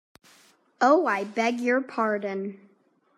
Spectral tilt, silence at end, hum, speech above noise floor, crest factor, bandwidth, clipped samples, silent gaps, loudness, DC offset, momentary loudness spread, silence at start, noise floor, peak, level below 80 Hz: -5 dB/octave; 0.6 s; none; 40 dB; 20 dB; 13 kHz; under 0.1%; none; -25 LUFS; under 0.1%; 12 LU; 0.8 s; -64 dBFS; -6 dBFS; -84 dBFS